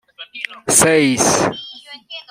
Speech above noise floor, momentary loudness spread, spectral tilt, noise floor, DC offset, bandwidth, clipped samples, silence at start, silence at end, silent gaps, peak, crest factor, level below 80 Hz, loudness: 22 dB; 22 LU; -2.5 dB/octave; -36 dBFS; under 0.1%; 16 kHz; under 0.1%; 0.2 s; 0.1 s; none; 0 dBFS; 18 dB; -50 dBFS; -13 LUFS